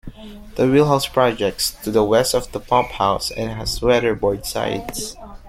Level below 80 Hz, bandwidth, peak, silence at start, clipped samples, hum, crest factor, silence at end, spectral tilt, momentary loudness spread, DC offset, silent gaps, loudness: -38 dBFS; 16.5 kHz; -2 dBFS; 0.05 s; under 0.1%; none; 18 dB; 0 s; -4.5 dB/octave; 12 LU; under 0.1%; none; -19 LUFS